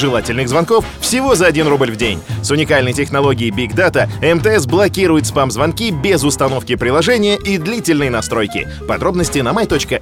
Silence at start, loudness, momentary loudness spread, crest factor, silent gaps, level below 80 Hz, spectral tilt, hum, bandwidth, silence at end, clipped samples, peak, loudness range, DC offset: 0 s; -14 LUFS; 5 LU; 14 dB; none; -34 dBFS; -4.5 dB/octave; none; 17 kHz; 0 s; under 0.1%; 0 dBFS; 2 LU; under 0.1%